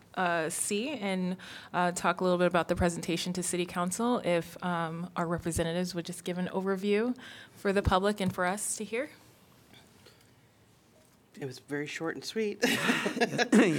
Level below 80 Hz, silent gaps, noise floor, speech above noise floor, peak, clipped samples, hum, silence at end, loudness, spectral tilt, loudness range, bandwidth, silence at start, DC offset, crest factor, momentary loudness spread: -54 dBFS; none; -62 dBFS; 32 dB; -12 dBFS; under 0.1%; none; 0 s; -31 LUFS; -4.5 dB/octave; 9 LU; 19 kHz; 0.15 s; under 0.1%; 20 dB; 9 LU